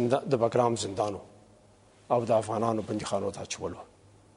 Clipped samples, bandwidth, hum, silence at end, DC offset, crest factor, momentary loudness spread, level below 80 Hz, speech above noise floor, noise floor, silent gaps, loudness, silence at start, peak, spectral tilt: under 0.1%; 11 kHz; none; 0.55 s; under 0.1%; 20 dB; 10 LU; -64 dBFS; 30 dB; -59 dBFS; none; -29 LUFS; 0 s; -10 dBFS; -5.5 dB/octave